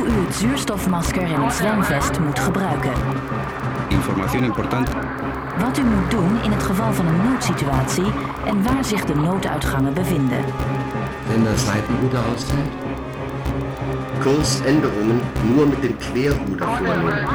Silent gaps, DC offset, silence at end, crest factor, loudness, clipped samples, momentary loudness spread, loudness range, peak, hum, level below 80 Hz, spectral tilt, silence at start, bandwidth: none; under 0.1%; 0 s; 16 dB; -20 LUFS; under 0.1%; 7 LU; 2 LU; -4 dBFS; none; -34 dBFS; -6 dB/octave; 0 s; over 20 kHz